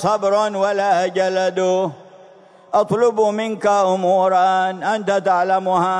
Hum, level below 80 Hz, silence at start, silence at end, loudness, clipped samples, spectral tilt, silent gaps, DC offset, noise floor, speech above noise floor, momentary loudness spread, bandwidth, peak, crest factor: none; -68 dBFS; 0 s; 0 s; -18 LUFS; under 0.1%; -5 dB/octave; none; under 0.1%; -46 dBFS; 29 dB; 5 LU; 11 kHz; -4 dBFS; 14 dB